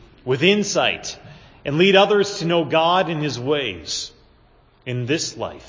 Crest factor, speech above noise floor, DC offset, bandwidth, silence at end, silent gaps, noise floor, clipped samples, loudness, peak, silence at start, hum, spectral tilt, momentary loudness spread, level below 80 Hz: 20 dB; 35 dB; under 0.1%; 7.6 kHz; 0 s; none; -54 dBFS; under 0.1%; -19 LUFS; 0 dBFS; 0.25 s; none; -4 dB/octave; 16 LU; -54 dBFS